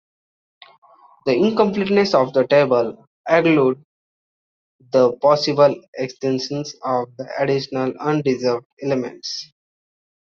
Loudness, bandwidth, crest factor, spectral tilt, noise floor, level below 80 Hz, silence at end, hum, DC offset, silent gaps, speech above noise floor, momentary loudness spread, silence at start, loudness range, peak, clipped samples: -19 LUFS; 7.2 kHz; 18 dB; -6 dB/octave; under -90 dBFS; -64 dBFS; 0.9 s; none; under 0.1%; 3.07-3.24 s, 3.85-4.79 s, 5.88-5.93 s, 8.65-8.77 s; over 72 dB; 12 LU; 1.25 s; 5 LU; -2 dBFS; under 0.1%